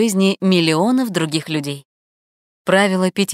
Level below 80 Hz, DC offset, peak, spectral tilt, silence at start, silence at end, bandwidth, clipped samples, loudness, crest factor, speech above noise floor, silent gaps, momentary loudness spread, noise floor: -66 dBFS; under 0.1%; 0 dBFS; -5 dB/octave; 0 s; 0 s; 16 kHz; under 0.1%; -17 LUFS; 18 dB; over 73 dB; 1.85-2.65 s; 11 LU; under -90 dBFS